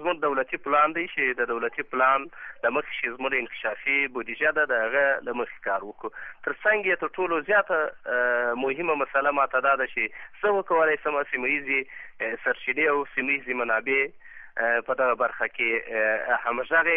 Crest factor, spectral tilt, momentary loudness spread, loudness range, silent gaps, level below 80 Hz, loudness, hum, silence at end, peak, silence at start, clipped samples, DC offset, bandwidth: 16 dB; -7.5 dB/octave; 8 LU; 2 LU; none; -64 dBFS; -25 LUFS; none; 0 s; -10 dBFS; 0 s; under 0.1%; under 0.1%; 3.8 kHz